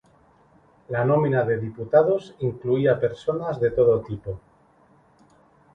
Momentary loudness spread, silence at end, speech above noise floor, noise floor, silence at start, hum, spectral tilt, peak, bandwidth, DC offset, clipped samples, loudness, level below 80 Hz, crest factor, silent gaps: 12 LU; 1.35 s; 36 dB; -58 dBFS; 0.9 s; none; -9 dB/octave; -4 dBFS; 6.6 kHz; under 0.1%; under 0.1%; -23 LUFS; -54 dBFS; 20 dB; none